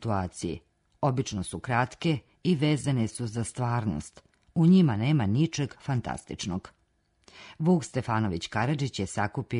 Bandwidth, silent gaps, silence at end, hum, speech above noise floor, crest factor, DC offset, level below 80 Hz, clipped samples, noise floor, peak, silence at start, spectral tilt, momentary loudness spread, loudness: 11 kHz; none; 0 s; none; 43 dB; 18 dB; under 0.1%; -56 dBFS; under 0.1%; -70 dBFS; -10 dBFS; 0 s; -6.5 dB/octave; 10 LU; -28 LUFS